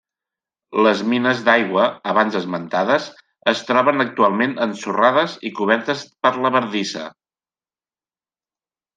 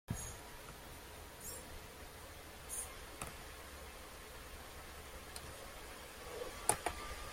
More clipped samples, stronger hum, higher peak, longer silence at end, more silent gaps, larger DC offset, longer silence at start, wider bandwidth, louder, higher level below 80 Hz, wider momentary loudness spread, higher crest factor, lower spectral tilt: neither; neither; first, -2 dBFS vs -10 dBFS; first, 1.85 s vs 0 s; neither; neither; first, 0.7 s vs 0.1 s; second, 9.4 kHz vs 16.5 kHz; first, -18 LUFS vs -46 LUFS; second, -70 dBFS vs -58 dBFS; second, 8 LU vs 13 LU; second, 18 dB vs 38 dB; first, -5 dB/octave vs -2.5 dB/octave